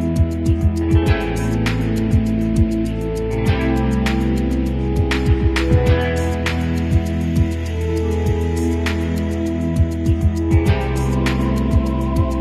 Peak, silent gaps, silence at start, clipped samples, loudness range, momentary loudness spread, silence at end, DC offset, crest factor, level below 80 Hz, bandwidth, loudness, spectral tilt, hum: -4 dBFS; none; 0 s; under 0.1%; 2 LU; 4 LU; 0 s; under 0.1%; 14 dB; -22 dBFS; 13 kHz; -19 LUFS; -7 dB/octave; none